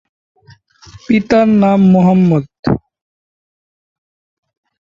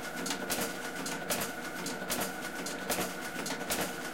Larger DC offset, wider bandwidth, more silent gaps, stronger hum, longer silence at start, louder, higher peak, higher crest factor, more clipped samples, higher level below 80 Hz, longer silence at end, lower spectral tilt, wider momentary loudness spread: second, under 0.1% vs 0.3%; second, 7.2 kHz vs 17 kHz; first, 2.59-2.63 s vs none; neither; first, 0.95 s vs 0 s; first, -12 LUFS vs -35 LUFS; first, -2 dBFS vs -18 dBFS; about the same, 14 dB vs 18 dB; neither; first, -44 dBFS vs -62 dBFS; first, 2.1 s vs 0 s; first, -9 dB/octave vs -2.5 dB/octave; first, 9 LU vs 4 LU